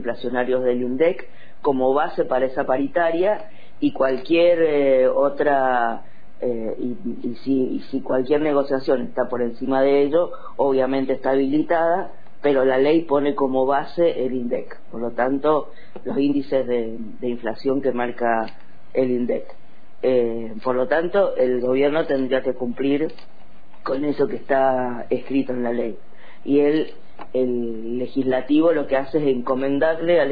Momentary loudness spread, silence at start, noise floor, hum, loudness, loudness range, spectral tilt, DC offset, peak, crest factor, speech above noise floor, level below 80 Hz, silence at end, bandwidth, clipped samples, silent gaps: 10 LU; 0 s; -50 dBFS; none; -21 LUFS; 4 LU; -9 dB/octave; 4%; -6 dBFS; 14 dB; 30 dB; -56 dBFS; 0 s; 5 kHz; under 0.1%; none